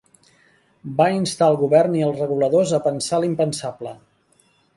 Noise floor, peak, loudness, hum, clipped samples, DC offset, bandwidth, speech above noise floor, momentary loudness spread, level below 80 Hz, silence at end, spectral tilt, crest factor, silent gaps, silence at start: -60 dBFS; -2 dBFS; -19 LUFS; none; under 0.1%; under 0.1%; 11.5 kHz; 41 dB; 14 LU; -62 dBFS; 0.8 s; -5.5 dB/octave; 18 dB; none; 0.85 s